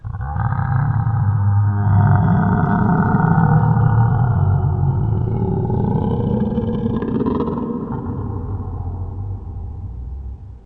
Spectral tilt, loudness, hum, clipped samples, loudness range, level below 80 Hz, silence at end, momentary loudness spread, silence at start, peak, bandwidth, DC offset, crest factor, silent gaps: -12 dB/octave; -18 LUFS; none; under 0.1%; 8 LU; -32 dBFS; 0.05 s; 14 LU; 0.05 s; -2 dBFS; 3.7 kHz; under 0.1%; 16 dB; none